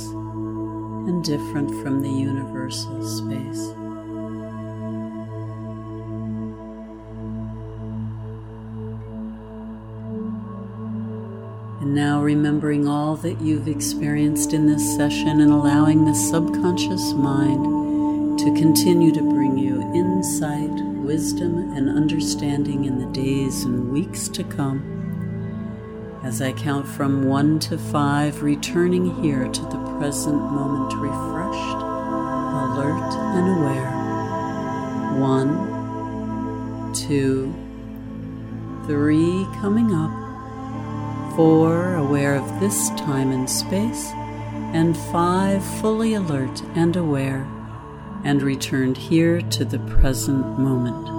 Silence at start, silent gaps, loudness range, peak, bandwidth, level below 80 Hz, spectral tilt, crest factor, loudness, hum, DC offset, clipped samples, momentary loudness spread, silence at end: 0 s; none; 13 LU; -4 dBFS; 16.5 kHz; -38 dBFS; -6 dB/octave; 18 dB; -22 LUFS; none; under 0.1%; under 0.1%; 14 LU; 0 s